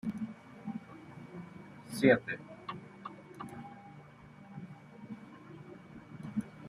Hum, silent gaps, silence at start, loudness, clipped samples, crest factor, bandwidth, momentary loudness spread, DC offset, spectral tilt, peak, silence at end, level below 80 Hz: none; none; 0.05 s; -36 LUFS; under 0.1%; 26 dB; 13.5 kHz; 22 LU; under 0.1%; -6.5 dB/octave; -12 dBFS; 0 s; -72 dBFS